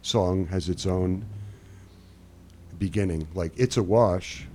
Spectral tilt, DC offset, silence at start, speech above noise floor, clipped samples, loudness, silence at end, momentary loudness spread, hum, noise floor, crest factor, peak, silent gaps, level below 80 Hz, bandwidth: -6 dB/octave; under 0.1%; 0.05 s; 25 dB; under 0.1%; -26 LUFS; 0 s; 17 LU; none; -50 dBFS; 18 dB; -8 dBFS; none; -46 dBFS; 13.5 kHz